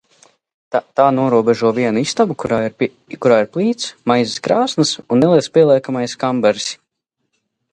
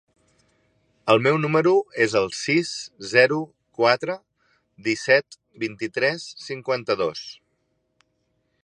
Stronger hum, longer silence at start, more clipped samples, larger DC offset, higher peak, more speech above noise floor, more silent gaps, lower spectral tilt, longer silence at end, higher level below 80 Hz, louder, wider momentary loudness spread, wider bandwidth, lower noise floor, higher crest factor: neither; second, 0.7 s vs 1.05 s; neither; neither; about the same, 0 dBFS vs -2 dBFS; first, 59 dB vs 50 dB; neither; about the same, -5 dB/octave vs -4.5 dB/octave; second, 1 s vs 1.3 s; first, -58 dBFS vs -66 dBFS; first, -16 LUFS vs -22 LUFS; second, 9 LU vs 14 LU; about the same, 11 kHz vs 11 kHz; about the same, -74 dBFS vs -72 dBFS; second, 16 dB vs 22 dB